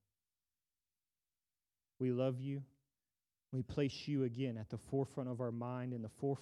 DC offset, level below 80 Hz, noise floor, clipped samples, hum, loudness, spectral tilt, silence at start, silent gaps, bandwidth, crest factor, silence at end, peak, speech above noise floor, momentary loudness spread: under 0.1%; -72 dBFS; under -90 dBFS; under 0.1%; none; -41 LUFS; -8 dB/octave; 2 s; none; 11.5 kHz; 18 dB; 0 s; -24 dBFS; over 50 dB; 7 LU